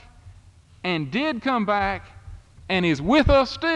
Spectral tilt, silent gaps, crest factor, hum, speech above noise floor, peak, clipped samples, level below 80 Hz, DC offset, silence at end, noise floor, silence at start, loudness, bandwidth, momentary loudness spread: -6.5 dB/octave; none; 18 dB; none; 29 dB; -6 dBFS; under 0.1%; -38 dBFS; under 0.1%; 0 s; -50 dBFS; 0.25 s; -22 LUFS; 10 kHz; 10 LU